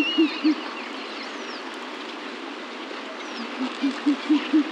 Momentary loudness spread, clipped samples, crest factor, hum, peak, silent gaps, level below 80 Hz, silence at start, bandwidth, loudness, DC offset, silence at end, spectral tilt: 12 LU; under 0.1%; 16 dB; none; -10 dBFS; none; -86 dBFS; 0 s; 9.4 kHz; -27 LUFS; under 0.1%; 0 s; -3 dB/octave